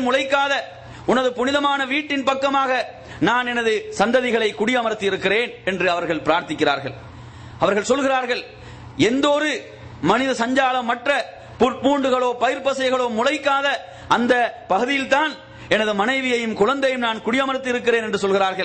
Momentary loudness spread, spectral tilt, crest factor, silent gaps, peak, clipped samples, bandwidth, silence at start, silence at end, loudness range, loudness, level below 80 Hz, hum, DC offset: 7 LU; -4 dB/octave; 16 dB; none; -4 dBFS; under 0.1%; 8.8 kHz; 0 s; 0 s; 2 LU; -20 LUFS; -54 dBFS; none; under 0.1%